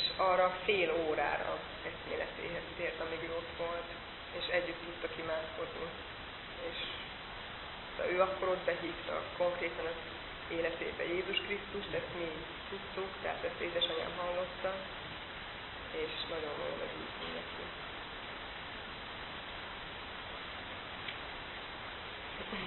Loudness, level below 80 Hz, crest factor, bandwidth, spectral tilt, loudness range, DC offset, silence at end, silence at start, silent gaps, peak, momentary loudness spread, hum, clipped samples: -38 LUFS; -58 dBFS; 22 dB; 4.2 kHz; -1.5 dB/octave; 7 LU; under 0.1%; 0 s; 0 s; none; -16 dBFS; 11 LU; none; under 0.1%